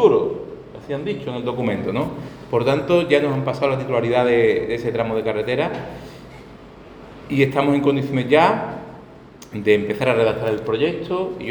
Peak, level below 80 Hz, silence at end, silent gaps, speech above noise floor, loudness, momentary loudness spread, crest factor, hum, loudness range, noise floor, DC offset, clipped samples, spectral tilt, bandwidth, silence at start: -2 dBFS; -50 dBFS; 0 s; none; 23 dB; -20 LUFS; 18 LU; 18 dB; none; 3 LU; -42 dBFS; under 0.1%; under 0.1%; -7 dB/octave; 19.5 kHz; 0 s